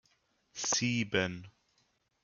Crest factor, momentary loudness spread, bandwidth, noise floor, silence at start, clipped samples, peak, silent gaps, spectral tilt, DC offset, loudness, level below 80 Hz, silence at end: 22 dB; 17 LU; 10.5 kHz; -75 dBFS; 0.55 s; under 0.1%; -16 dBFS; none; -3 dB/octave; under 0.1%; -32 LUFS; -72 dBFS; 0.75 s